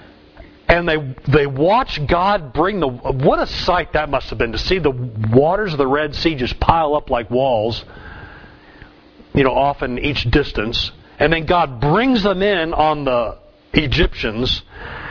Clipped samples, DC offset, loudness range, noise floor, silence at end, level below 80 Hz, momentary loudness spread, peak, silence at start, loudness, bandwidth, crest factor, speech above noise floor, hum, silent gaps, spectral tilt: under 0.1%; under 0.1%; 3 LU; -45 dBFS; 0 s; -30 dBFS; 7 LU; 0 dBFS; 0.35 s; -17 LUFS; 5.4 kHz; 18 dB; 28 dB; none; none; -7 dB/octave